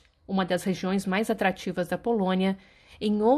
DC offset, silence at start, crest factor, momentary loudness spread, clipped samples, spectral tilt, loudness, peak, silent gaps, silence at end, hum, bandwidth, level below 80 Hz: under 0.1%; 0.3 s; 16 dB; 6 LU; under 0.1%; -6 dB/octave; -27 LUFS; -10 dBFS; none; 0 s; none; 14.5 kHz; -58 dBFS